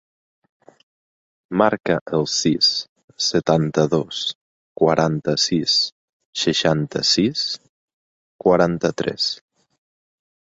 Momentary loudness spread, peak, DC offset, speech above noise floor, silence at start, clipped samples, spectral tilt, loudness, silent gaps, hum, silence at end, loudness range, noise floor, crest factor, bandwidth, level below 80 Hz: 9 LU; -2 dBFS; under 0.1%; over 71 dB; 1.5 s; under 0.1%; -4 dB/octave; -19 LUFS; 2.01-2.06 s, 2.89-2.96 s, 3.04-3.08 s, 4.35-4.75 s, 5.92-6.20 s, 6.26-6.33 s, 7.69-8.39 s; none; 1.05 s; 2 LU; under -90 dBFS; 20 dB; 8 kHz; -54 dBFS